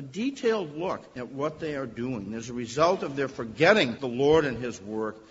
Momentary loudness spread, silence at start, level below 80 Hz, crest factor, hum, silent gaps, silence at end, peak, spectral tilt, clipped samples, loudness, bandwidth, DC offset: 13 LU; 0 s; -58 dBFS; 22 dB; none; none; 0.1 s; -6 dBFS; -5 dB/octave; under 0.1%; -27 LUFS; 8 kHz; under 0.1%